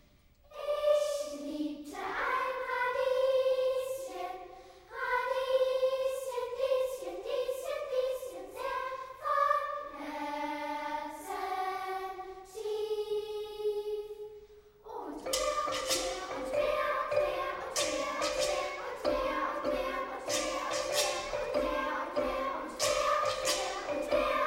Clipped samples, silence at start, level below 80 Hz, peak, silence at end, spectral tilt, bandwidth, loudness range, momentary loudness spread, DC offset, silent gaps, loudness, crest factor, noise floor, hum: under 0.1%; 0.5 s; -58 dBFS; -16 dBFS; 0 s; -2 dB/octave; 16 kHz; 5 LU; 10 LU; under 0.1%; none; -33 LUFS; 18 dB; -62 dBFS; none